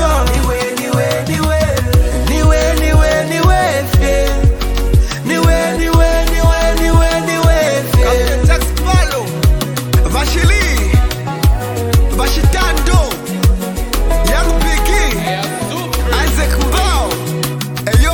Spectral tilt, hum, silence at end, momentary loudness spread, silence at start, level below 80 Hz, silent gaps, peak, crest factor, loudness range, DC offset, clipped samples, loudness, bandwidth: -5 dB/octave; none; 0 s; 6 LU; 0 s; -14 dBFS; none; 0 dBFS; 12 dB; 2 LU; under 0.1%; under 0.1%; -14 LUFS; 19 kHz